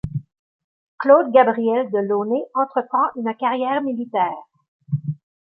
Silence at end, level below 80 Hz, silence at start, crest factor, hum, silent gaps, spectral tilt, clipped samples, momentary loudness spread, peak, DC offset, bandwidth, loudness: 0.35 s; -54 dBFS; 0.05 s; 18 dB; none; 0.39-0.98 s, 4.68-4.80 s; -10 dB/octave; under 0.1%; 13 LU; -2 dBFS; under 0.1%; 4.7 kHz; -20 LUFS